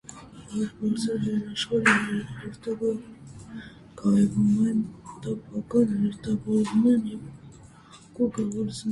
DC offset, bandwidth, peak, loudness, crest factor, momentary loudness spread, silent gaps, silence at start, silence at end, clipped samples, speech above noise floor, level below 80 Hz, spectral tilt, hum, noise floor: under 0.1%; 11.5 kHz; -6 dBFS; -26 LUFS; 22 dB; 21 LU; none; 0.1 s; 0 s; under 0.1%; 25 dB; -56 dBFS; -6 dB/octave; none; -50 dBFS